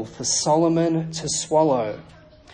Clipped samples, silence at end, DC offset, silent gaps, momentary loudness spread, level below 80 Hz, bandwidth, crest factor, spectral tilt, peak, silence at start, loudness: under 0.1%; 0.5 s; under 0.1%; none; 7 LU; -54 dBFS; 10 kHz; 16 dB; -4.5 dB/octave; -6 dBFS; 0 s; -21 LUFS